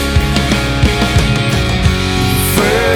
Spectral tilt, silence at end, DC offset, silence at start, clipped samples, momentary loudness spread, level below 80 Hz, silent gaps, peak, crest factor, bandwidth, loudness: -5 dB/octave; 0 s; under 0.1%; 0 s; under 0.1%; 2 LU; -20 dBFS; none; 0 dBFS; 12 dB; 19.5 kHz; -13 LUFS